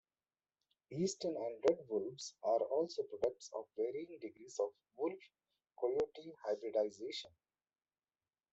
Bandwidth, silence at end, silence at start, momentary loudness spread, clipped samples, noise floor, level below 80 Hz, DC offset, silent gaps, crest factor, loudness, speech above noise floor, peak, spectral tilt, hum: 8.2 kHz; 1.25 s; 0.9 s; 11 LU; under 0.1%; under -90 dBFS; -82 dBFS; under 0.1%; none; 20 dB; -40 LUFS; over 50 dB; -20 dBFS; -5 dB/octave; none